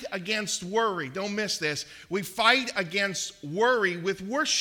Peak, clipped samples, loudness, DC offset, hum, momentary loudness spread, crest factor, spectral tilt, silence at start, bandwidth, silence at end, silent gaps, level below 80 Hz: -4 dBFS; under 0.1%; -27 LUFS; under 0.1%; none; 11 LU; 22 dB; -2.5 dB/octave; 0 s; 18 kHz; 0 s; none; -66 dBFS